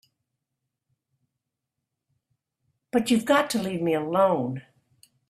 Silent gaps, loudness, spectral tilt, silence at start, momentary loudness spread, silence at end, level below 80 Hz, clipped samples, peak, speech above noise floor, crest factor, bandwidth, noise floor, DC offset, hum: none; -24 LUFS; -5 dB/octave; 2.95 s; 7 LU; 0.7 s; -68 dBFS; under 0.1%; -6 dBFS; 61 dB; 22 dB; 15 kHz; -84 dBFS; under 0.1%; none